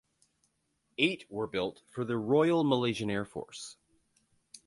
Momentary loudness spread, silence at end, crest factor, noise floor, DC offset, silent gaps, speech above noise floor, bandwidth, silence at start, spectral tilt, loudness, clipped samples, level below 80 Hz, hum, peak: 17 LU; 0.1 s; 22 dB; -77 dBFS; under 0.1%; none; 47 dB; 11.5 kHz; 1 s; -5.5 dB/octave; -31 LUFS; under 0.1%; -68 dBFS; none; -12 dBFS